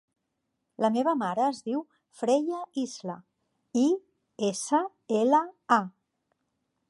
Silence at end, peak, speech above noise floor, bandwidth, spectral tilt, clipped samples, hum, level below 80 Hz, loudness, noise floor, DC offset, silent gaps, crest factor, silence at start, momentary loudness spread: 1 s; -8 dBFS; 54 dB; 11.5 kHz; -4.5 dB/octave; under 0.1%; none; -84 dBFS; -28 LUFS; -81 dBFS; under 0.1%; none; 20 dB; 0.8 s; 10 LU